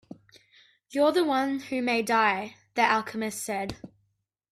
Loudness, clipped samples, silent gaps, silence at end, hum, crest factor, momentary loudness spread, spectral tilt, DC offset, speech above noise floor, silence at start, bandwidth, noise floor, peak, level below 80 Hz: -26 LUFS; under 0.1%; none; 0.65 s; none; 20 dB; 11 LU; -3.5 dB/octave; under 0.1%; 50 dB; 0.9 s; 16 kHz; -76 dBFS; -8 dBFS; -64 dBFS